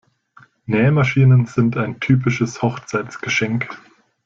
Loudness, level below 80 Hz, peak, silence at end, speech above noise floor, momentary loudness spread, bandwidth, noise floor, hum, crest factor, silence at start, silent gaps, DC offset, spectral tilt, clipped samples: -18 LUFS; -52 dBFS; -4 dBFS; 0.5 s; 34 dB; 11 LU; 7.4 kHz; -51 dBFS; none; 14 dB; 0.7 s; none; under 0.1%; -7 dB/octave; under 0.1%